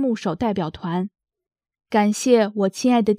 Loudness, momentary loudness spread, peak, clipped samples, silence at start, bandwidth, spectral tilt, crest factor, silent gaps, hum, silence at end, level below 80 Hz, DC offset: -21 LUFS; 9 LU; -4 dBFS; under 0.1%; 0 s; 15.5 kHz; -5.5 dB/octave; 18 dB; none; none; 0 s; -56 dBFS; under 0.1%